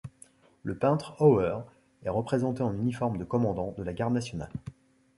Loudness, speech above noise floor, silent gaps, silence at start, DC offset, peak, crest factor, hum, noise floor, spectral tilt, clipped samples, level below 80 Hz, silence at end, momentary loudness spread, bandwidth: -29 LUFS; 30 dB; none; 0.05 s; under 0.1%; -8 dBFS; 20 dB; none; -58 dBFS; -8 dB/octave; under 0.1%; -54 dBFS; 0.45 s; 16 LU; 11.5 kHz